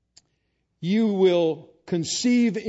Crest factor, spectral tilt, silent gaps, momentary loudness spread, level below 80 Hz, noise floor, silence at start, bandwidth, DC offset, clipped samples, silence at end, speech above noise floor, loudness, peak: 14 dB; -5 dB/octave; none; 11 LU; -70 dBFS; -73 dBFS; 0.8 s; 8 kHz; under 0.1%; under 0.1%; 0 s; 52 dB; -22 LUFS; -8 dBFS